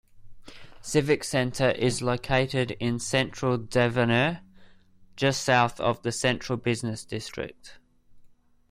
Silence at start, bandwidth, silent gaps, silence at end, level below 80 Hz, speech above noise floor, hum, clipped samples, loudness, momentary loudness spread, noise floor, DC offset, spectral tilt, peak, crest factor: 0.15 s; 15.5 kHz; none; 0.45 s; -52 dBFS; 29 dB; none; under 0.1%; -26 LUFS; 11 LU; -55 dBFS; under 0.1%; -5 dB/octave; -8 dBFS; 20 dB